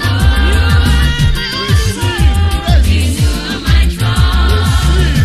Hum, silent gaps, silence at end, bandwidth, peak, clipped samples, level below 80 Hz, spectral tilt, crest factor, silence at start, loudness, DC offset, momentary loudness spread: none; none; 0 s; 14 kHz; 0 dBFS; under 0.1%; -12 dBFS; -5 dB/octave; 10 dB; 0 s; -12 LUFS; under 0.1%; 3 LU